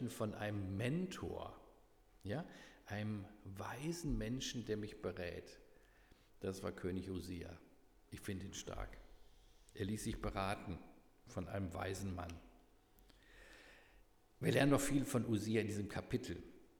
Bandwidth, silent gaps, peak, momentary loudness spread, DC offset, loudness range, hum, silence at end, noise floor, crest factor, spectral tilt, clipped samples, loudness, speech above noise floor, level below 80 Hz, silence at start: over 20 kHz; none; -22 dBFS; 20 LU; under 0.1%; 9 LU; none; 0.1 s; -68 dBFS; 22 dB; -5.5 dB/octave; under 0.1%; -43 LUFS; 26 dB; -60 dBFS; 0 s